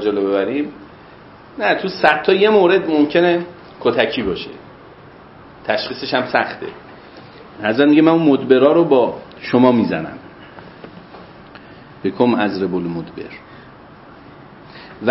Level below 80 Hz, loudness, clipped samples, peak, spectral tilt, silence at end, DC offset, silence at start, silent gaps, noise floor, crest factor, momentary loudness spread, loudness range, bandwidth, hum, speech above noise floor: -54 dBFS; -16 LUFS; under 0.1%; 0 dBFS; -8.5 dB/octave; 0 s; under 0.1%; 0 s; none; -41 dBFS; 18 dB; 25 LU; 8 LU; 5.8 kHz; none; 26 dB